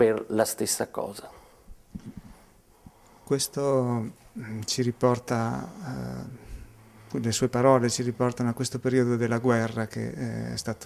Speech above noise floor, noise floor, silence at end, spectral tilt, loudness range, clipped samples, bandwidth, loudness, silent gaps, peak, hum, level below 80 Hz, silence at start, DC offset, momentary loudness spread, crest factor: 30 dB; -56 dBFS; 0 s; -5 dB/octave; 7 LU; under 0.1%; 16 kHz; -27 LUFS; none; -8 dBFS; none; -54 dBFS; 0 s; under 0.1%; 20 LU; 20 dB